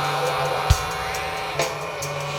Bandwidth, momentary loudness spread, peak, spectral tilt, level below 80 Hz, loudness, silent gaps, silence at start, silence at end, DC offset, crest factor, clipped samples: 18 kHz; 6 LU; -2 dBFS; -3.5 dB/octave; -34 dBFS; -24 LUFS; none; 0 s; 0 s; under 0.1%; 22 dB; under 0.1%